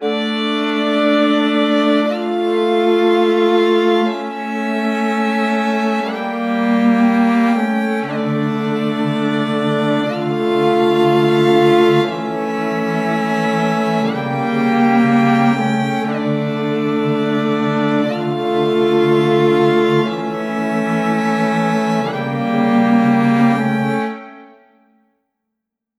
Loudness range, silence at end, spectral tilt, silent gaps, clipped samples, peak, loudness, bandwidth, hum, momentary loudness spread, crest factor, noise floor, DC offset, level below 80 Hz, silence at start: 2 LU; 1.55 s; -6.5 dB/octave; none; under 0.1%; -2 dBFS; -16 LUFS; 12 kHz; none; 6 LU; 14 dB; -79 dBFS; under 0.1%; -68 dBFS; 0 s